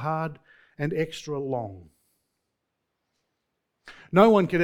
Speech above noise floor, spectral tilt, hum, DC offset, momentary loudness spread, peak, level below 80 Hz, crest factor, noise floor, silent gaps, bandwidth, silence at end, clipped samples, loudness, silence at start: 56 dB; -7 dB/octave; none; under 0.1%; 15 LU; -2 dBFS; -62 dBFS; 24 dB; -80 dBFS; none; 18 kHz; 0 s; under 0.1%; -25 LUFS; 0 s